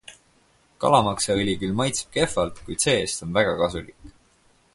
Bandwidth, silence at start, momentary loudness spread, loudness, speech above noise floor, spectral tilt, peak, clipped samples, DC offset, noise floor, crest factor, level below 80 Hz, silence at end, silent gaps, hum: 11.5 kHz; 0.1 s; 7 LU; -23 LUFS; 38 dB; -4 dB/octave; -4 dBFS; under 0.1%; under 0.1%; -61 dBFS; 22 dB; -48 dBFS; 0.65 s; none; none